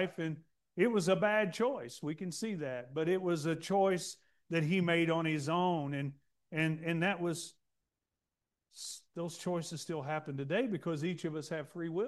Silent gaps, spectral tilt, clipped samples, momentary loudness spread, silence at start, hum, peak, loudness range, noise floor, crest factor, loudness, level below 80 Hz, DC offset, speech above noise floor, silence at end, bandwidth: none; -5.5 dB/octave; under 0.1%; 12 LU; 0 s; none; -16 dBFS; 6 LU; -90 dBFS; 20 dB; -35 LUFS; -78 dBFS; under 0.1%; 56 dB; 0 s; 12.5 kHz